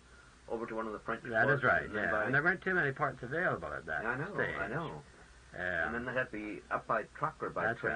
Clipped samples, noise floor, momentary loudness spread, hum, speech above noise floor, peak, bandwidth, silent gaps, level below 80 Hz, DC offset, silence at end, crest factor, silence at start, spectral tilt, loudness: under 0.1%; -57 dBFS; 10 LU; none; 22 dB; -16 dBFS; 10 kHz; none; -60 dBFS; under 0.1%; 0 s; 20 dB; 0.1 s; -6.5 dB/octave; -34 LUFS